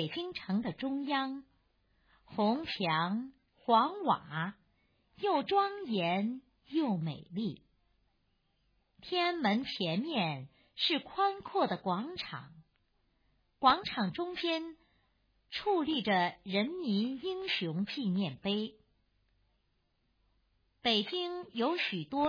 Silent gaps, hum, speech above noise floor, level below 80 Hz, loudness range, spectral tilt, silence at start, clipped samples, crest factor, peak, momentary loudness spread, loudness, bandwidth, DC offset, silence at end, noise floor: none; none; 44 dB; -72 dBFS; 4 LU; -6.5 dB/octave; 0 s; under 0.1%; 24 dB; -10 dBFS; 10 LU; -33 LUFS; 5.2 kHz; under 0.1%; 0 s; -77 dBFS